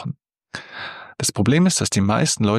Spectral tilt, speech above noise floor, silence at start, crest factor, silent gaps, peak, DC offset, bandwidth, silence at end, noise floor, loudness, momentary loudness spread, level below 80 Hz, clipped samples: -4.5 dB/octave; 21 dB; 0 s; 16 dB; none; -4 dBFS; under 0.1%; 14 kHz; 0 s; -39 dBFS; -18 LUFS; 19 LU; -52 dBFS; under 0.1%